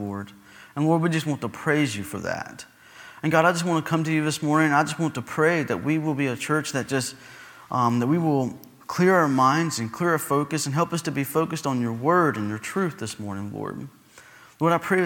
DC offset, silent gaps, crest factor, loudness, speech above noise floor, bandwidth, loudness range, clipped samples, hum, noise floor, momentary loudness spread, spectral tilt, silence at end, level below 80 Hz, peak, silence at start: under 0.1%; none; 20 dB; -24 LUFS; 26 dB; 18.5 kHz; 3 LU; under 0.1%; none; -50 dBFS; 13 LU; -5.5 dB/octave; 0 s; -66 dBFS; -4 dBFS; 0 s